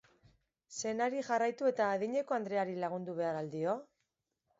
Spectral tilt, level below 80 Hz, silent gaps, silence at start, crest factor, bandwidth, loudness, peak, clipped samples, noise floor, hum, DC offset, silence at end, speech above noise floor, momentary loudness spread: -4.5 dB/octave; -80 dBFS; none; 0.7 s; 16 dB; 7.6 kHz; -35 LUFS; -20 dBFS; under 0.1%; -85 dBFS; none; under 0.1%; 0.75 s; 50 dB; 6 LU